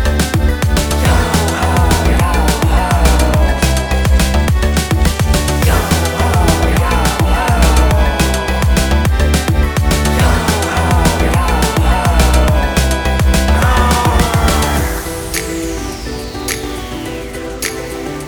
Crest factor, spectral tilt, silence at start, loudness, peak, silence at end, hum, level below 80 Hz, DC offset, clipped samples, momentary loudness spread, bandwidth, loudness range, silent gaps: 12 dB; -5 dB/octave; 0 s; -13 LUFS; 0 dBFS; 0 s; none; -16 dBFS; under 0.1%; under 0.1%; 8 LU; over 20 kHz; 3 LU; none